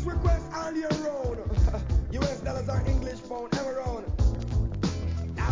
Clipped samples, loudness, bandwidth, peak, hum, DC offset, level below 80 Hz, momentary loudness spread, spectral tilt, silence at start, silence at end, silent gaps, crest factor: under 0.1%; -30 LUFS; 7.6 kHz; -12 dBFS; none; 0.2%; -30 dBFS; 5 LU; -7 dB/octave; 0 s; 0 s; none; 16 dB